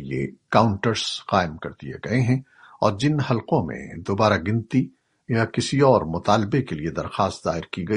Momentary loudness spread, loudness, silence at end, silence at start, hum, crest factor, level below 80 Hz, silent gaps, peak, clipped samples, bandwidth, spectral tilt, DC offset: 10 LU; -23 LUFS; 0 s; 0 s; none; 20 dB; -50 dBFS; none; -2 dBFS; under 0.1%; 10.5 kHz; -6 dB/octave; under 0.1%